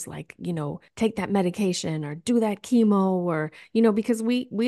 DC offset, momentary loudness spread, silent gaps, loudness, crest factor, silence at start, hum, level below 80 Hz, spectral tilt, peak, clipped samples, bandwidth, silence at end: under 0.1%; 10 LU; none; -25 LUFS; 16 dB; 0 s; none; -64 dBFS; -6 dB/octave; -8 dBFS; under 0.1%; 12.5 kHz; 0 s